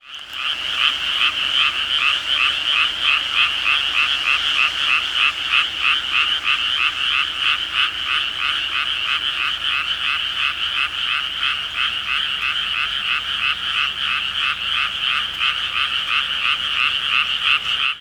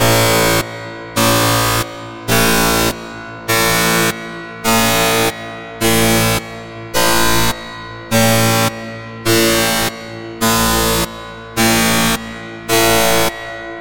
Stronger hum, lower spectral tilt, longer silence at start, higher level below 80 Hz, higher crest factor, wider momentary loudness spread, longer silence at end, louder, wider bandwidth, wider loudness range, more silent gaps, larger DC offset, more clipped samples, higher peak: neither; second, 0.5 dB/octave vs -3 dB/octave; about the same, 0.05 s vs 0 s; second, -50 dBFS vs -34 dBFS; about the same, 18 dB vs 14 dB; second, 4 LU vs 16 LU; about the same, 0 s vs 0 s; second, -17 LUFS vs -14 LUFS; about the same, 17 kHz vs 17 kHz; about the same, 3 LU vs 1 LU; neither; neither; neither; about the same, -2 dBFS vs 0 dBFS